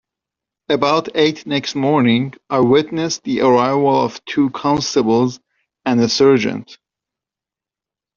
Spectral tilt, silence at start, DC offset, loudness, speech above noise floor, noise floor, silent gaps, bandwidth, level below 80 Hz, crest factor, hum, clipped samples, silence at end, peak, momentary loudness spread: -4.5 dB/octave; 0.7 s; under 0.1%; -16 LUFS; 73 dB; -88 dBFS; none; 7.4 kHz; -56 dBFS; 16 dB; none; under 0.1%; 1.4 s; 0 dBFS; 8 LU